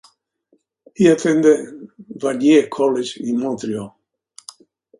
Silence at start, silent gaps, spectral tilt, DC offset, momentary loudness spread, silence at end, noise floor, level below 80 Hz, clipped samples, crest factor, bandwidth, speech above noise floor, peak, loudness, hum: 1 s; none; -5.5 dB/octave; under 0.1%; 24 LU; 1.1 s; -63 dBFS; -64 dBFS; under 0.1%; 18 dB; 11.5 kHz; 46 dB; 0 dBFS; -17 LUFS; none